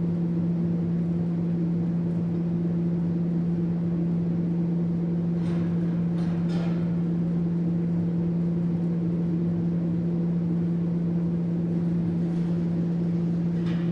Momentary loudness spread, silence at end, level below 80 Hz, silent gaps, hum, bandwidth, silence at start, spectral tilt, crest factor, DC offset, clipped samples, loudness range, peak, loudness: 1 LU; 0 s; -54 dBFS; none; none; 4.5 kHz; 0 s; -10.5 dB/octave; 10 dB; under 0.1%; under 0.1%; 0 LU; -16 dBFS; -26 LUFS